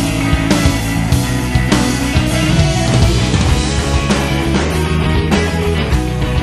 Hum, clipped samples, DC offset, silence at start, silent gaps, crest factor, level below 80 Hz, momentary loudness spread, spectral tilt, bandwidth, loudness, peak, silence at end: none; under 0.1%; under 0.1%; 0 s; none; 14 dB; -20 dBFS; 3 LU; -5 dB/octave; 13.5 kHz; -14 LUFS; 0 dBFS; 0 s